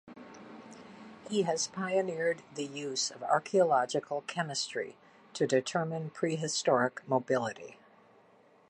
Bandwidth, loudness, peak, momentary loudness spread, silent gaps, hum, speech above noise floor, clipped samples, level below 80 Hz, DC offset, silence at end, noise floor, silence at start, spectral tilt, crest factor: 11 kHz; -32 LUFS; -12 dBFS; 22 LU; none; none; 31 dB; under 0.1%; -80 dBFS; under 0.1%; 0.95 s; -62 dBFS; 0.05 s; -4 dB/octave; 20 dB